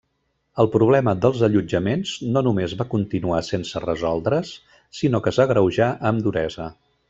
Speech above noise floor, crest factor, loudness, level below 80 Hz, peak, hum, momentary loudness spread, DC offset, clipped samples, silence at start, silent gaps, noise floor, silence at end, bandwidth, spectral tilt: 51 dB; 18 dB; -21 LUFS; -50 dBFS; -2 dBFS; none; 9 LU; under 0.1%; under 0.1%; 0.55 s; none; -71 dBFS; 0.4 s; 8 kHz; -7 dB/octave